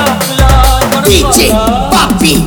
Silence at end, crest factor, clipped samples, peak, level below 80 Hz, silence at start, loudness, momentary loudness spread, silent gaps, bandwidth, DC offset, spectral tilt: 0 s; 8 dB; 3%; 0 dBFS; -14 dBFS; 0 s; -8 LUFS; 3 LU; none; over 20 kHz; under 0.1%; -4 dB/octave